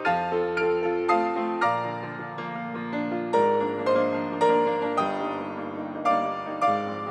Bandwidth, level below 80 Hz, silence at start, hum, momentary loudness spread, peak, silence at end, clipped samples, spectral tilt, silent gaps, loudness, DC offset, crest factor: 9.6 kHz; -74 dBFS; 0 s; none; 10 LU; -8 dBFS; 0 s; under 0.1%; -6.5 dB/octave; none; -26 LUFS; under 0.1%; 16 dB